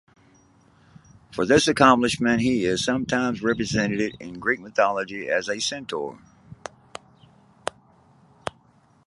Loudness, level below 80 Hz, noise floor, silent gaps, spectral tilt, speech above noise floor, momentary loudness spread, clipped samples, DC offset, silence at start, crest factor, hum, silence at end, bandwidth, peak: -22 LUFS; -54 dBFS; -58 dBFS; none; -4 dB/octave; 36 dB; 21 LU; under 0.1%; under 0.1%; 1.3 s; 24 dB; none; 0.55 s; 11.5 kHz; -2 dBFS